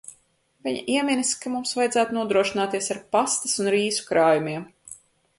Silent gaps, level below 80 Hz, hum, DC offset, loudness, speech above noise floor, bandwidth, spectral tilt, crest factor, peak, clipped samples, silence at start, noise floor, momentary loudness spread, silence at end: none; -66 dBFS; none; under 0.1%; -23 LUFS; 41 dB; 11.5 kHz; -3 dB/octave; 18 dB; -6 dBFS; under 0.1%; 0.65 s; -64 dBFS; 12 LU; 0.45 s